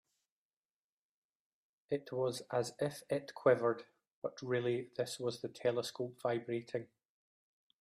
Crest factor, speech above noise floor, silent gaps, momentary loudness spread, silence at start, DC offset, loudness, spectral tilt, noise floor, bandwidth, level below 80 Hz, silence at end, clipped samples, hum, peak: 22 dB; over 53 dB; 4.12-4.22 s; 11 LU; 1.9 s; under 0.1%; -38 LUFS; -5.5 dB/octave; under -90 dBFS; 15 kHz; -82 dBFS; 0.95 s; under 0.1%; none; -16 dBFS